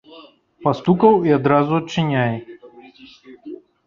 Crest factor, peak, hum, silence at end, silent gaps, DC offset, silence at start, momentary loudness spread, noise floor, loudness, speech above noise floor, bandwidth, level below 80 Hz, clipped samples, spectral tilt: 18 dB; -2 dBFS; none; 0.3 s; none; under 0.1%; 0.1 s; 21 LU; -45 dBFS; -17 LUFS; 29 dB; 7.2 kHz; -56 dBFS; under 0.1%; -7.5 dB/octave